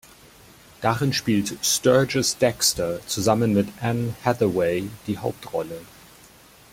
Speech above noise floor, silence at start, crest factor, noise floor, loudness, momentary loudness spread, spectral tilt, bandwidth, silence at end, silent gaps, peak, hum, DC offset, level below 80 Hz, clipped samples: 28 dB; 0.8 s; 20 dB; -50 dBFS; -22 LUFS; 11 LU; -4 dB/octave; 16.5 kHz; 0.85 s; none; -4 dBFS; none; under 0.1%; -54 dBFS; under 0.1%